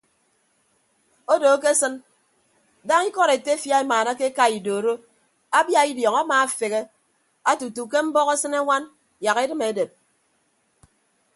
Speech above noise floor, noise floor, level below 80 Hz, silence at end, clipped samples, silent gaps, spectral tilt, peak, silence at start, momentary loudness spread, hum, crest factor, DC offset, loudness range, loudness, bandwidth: 46 dB; -67 dBFS; -76 dBFS; 1.5 s; under 0.1%; none; -2 dB/octave; -4 dBFS; 1.3 s; 10 LU; none; 18 dB; under 0.1%; 3 LU; -21 LUFS; 12 kHz